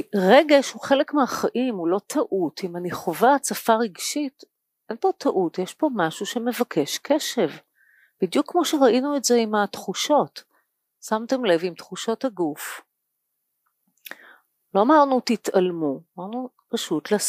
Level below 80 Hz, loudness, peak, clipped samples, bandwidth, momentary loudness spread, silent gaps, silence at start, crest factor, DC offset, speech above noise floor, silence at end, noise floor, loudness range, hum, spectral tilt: -74 dBFS; -22 LUFS; -2 dBFS; under 0.1%; 15.5 kHz; 14 LU; none; 0.15 s; 22 dB; under 0.1%; 56 dB; 0 s; -78 dBFS; 5 LU; none; -4 dB/octave